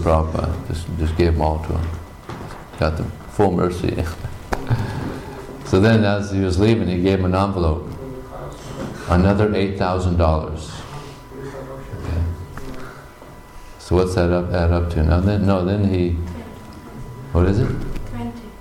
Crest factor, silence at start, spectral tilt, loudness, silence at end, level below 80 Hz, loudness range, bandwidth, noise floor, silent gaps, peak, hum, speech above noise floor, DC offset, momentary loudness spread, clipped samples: 14 dB; 0 s; -7.5 dB/octave; -20 LUFS; 0 s; -32 dBFS; 5 LU; 13 kHz; -40 dBFS; none; -6 dBFS; none; 22 dB; under 0.1%; 18 LU; under 0.1%